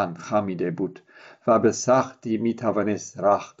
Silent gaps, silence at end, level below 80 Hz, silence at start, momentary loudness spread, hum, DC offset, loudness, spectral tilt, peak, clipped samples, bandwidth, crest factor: none; 0.1 s; -70 dBFS; 0 s; 8 LU; none; under 0.1%; -24 LUFS; -5.5 dB/octave; -6 dBFS; under 0.1%; 8 kHz; 16 dB